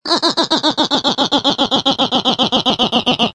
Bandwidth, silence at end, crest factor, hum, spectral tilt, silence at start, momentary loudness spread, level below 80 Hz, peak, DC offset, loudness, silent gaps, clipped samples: 10.5 kHz; 0.05 s; 14 dB; none; -3.5 dB/octave; 0.05 s; 1 LU; -50 dBFS; 0 dBFS; under 0.1%; -14 LUFS; none; under 0.1%